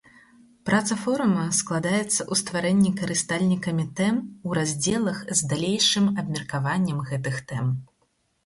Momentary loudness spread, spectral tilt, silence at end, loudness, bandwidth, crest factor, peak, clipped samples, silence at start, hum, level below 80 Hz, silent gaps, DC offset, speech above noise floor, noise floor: 8 LU; -4 dB/octave; 0.6 s; -24 LUFS; 11.5 kHz; 18 dB; -8 dBFS; under 0.1%; 0.65 s; none; -58 dBFS; none; under 0.1%; 45 dB; -70 dBFS